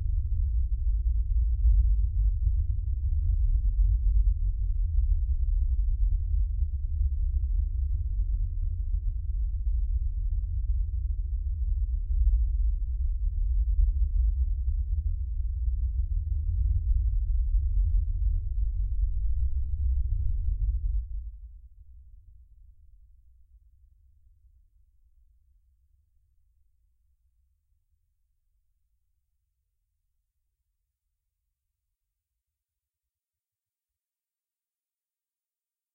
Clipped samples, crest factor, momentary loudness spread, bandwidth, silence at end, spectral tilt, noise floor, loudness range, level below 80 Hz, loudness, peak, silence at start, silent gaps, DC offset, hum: under 0.1%; 14 dB; 5 LU; 0.4 kHz; 13.3 s; -13 dB/octave; under -90 dBFS; 4 LU; -28 dBFS; -30 LUFS; -14 dBFS; 0 s; none; under 0.1%; none